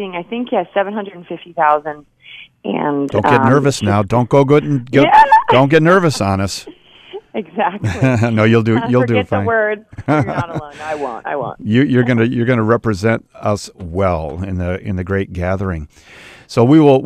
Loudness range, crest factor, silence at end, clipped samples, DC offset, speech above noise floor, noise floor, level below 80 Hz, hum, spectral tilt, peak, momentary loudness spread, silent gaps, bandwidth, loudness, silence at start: 7 LU; 14 dB; 0 s; under 0.1%; under 0.1%; 20 dB; -35 dBFS; -42 dBFS; none; -7 dB/octave; 0 dBFS; 15 LU; none; 13 kHz; -15 LUFS; 0 s